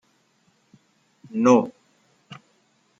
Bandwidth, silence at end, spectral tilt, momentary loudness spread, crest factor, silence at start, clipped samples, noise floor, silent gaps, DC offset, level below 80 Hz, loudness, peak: 7.8 kHz; 0.65 s; -6 dB/octave; 28 LU; 22 dB; 1.35 s; under 0.1%; -65 dBFS; none; under 0.1%; -74 dBFS; -21 LUFS; -4 dBFS